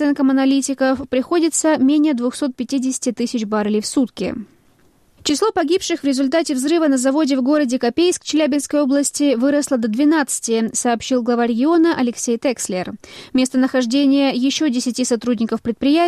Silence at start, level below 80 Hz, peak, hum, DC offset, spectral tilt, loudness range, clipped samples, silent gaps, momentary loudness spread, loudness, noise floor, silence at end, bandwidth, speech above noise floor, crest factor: 0 s; -56 dBFS; -6 dBFS; none; under 0.1%; -3.5 dB/octave; 3 LU; under 0.1%; none; 6 LU; -18 LUFS; -54 dBFS; 0 s; 13.5 kHz; 37 dB; 10 dB